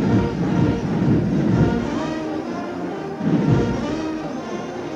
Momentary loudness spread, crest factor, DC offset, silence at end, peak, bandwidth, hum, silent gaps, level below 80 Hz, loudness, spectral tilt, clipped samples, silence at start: 10 LU; 16 dB; under 0.1%; 0 s; -4 dBFS; 8.2 kHz; none; none; -38 dBFS; -21 LUFS; -8 dB/octave; under 0.1%; 0 s